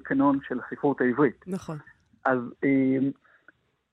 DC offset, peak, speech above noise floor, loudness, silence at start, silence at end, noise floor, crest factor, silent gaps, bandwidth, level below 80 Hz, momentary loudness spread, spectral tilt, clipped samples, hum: under 0.1%; -10 dBFS; 36 dB; -26 LUFS; 0.05 s; 0.8 s; -61 dBFS; 18 dB; none; 6.2 kHz; -68 dBFS; 12 LU; -8.5 dB/octave; under 0.1%; none